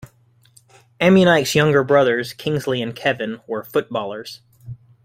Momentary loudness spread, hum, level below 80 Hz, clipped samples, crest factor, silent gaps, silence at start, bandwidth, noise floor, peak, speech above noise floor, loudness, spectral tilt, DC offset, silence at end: 23 LU; none; -56 dBFS; under 0.1%; 18 dB; none; 1 s; 16 kHz; -55 dBFS; -2 dBFS; 37 dB; -18 LUFS; -5.5 dB/octave; under 0.1%; 0.3 s